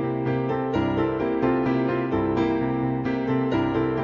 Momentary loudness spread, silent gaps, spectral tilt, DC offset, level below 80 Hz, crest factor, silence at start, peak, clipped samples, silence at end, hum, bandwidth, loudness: 3 LU; none; -9 dB/octave; under 0.1%; -46 dBFS; 12 dB; 0 s; -12 dBFS; under 0.1%; 0 s; none; 6.8 kHz; -24 LUFS